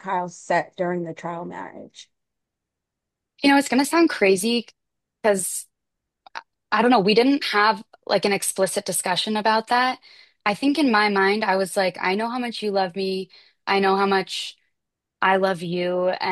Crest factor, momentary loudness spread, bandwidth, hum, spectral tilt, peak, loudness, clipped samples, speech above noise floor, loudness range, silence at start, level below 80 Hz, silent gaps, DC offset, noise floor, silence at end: 18 dB; 14 LU; 12.5 kHz; none; -3.5 dB/octave; -6 dBFS; -21 LUFS; under 0.1%; 62 dB; 3 LU; 0.05 s; -72 dBFS; none; under 0.1%; -83 dBFS; 0 s